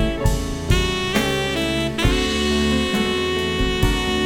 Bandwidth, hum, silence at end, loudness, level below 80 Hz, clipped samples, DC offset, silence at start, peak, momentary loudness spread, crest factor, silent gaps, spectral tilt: 18.5 kHz; none; 0 s; -20 LUFS; -26 dBFS; under 0.1%; under 0.1%; 0 s; -4 dBFS; 2 LU; 16 dB; none; -4.5 dB/octave